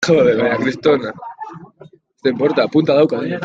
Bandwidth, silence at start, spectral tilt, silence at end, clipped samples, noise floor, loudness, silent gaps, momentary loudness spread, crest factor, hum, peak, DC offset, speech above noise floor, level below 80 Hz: 7.8 kHz; 0 s; -6 dB/octave; 0 s; under 0.1%; -45 dBFS; -16 LUFS; none; 18 LU; 14 dB; none; -2 dBFS; under 0.1%; 30 dB; -56 dBFS